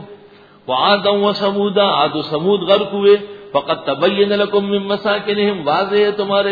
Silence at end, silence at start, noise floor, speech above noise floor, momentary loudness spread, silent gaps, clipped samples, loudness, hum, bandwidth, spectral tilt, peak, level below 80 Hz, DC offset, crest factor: 0 s; 0 s; -44 dBFS; 29 dB; 6 LU; none; under 0.1%; -16 LUFS; none; 5 kHz; -7.5 dB/octave; 0 dBFS; -58 dBFS; under 0.1%; 16 dB